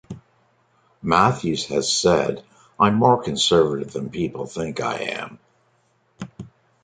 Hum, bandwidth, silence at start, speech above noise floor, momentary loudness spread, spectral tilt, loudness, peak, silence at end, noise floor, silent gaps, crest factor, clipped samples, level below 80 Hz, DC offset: none; 9.6 kHz; 0.1 s; 43 dB; 20 LU; -4.5 dB/octave; -21 LUFS; -2 dBFS; 0.4 s; -64 dBFS; none; 22 dB; under 0.1%; -52 dBFS; under 0.1%